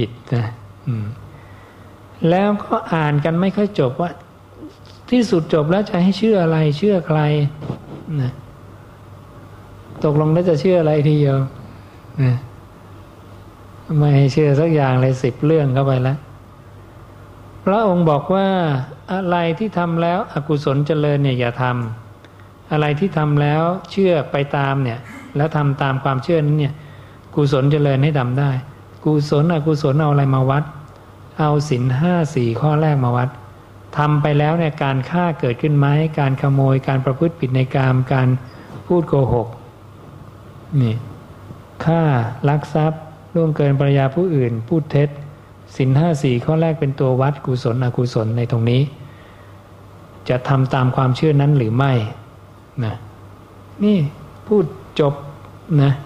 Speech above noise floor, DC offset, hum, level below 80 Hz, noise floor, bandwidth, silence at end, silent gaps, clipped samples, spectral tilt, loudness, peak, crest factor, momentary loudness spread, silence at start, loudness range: 26 dB; under 0.1%; none; -48 dBFS; -42 dBFS; 8.2 kHz; 0 s; none; under 0.1%; -8.5 dB/octave; -18 LUFS; -2 dBFS; 16 dB; 12 LU; 0 s; 4 LU